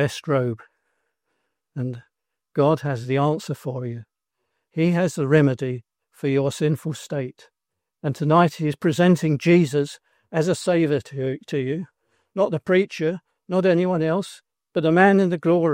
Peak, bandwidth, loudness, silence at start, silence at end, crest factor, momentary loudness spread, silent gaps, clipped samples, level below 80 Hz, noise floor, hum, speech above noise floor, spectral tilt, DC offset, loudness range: -2 dBFS; 16 kHz; -22 LUFS; 0 s; 0 s; 20 dB; 13 LU; none; under 0.1%; -66 dBFS; -84 dBFS; none; 63 dB; -7 dB/octave; under 0.1%; 5 LU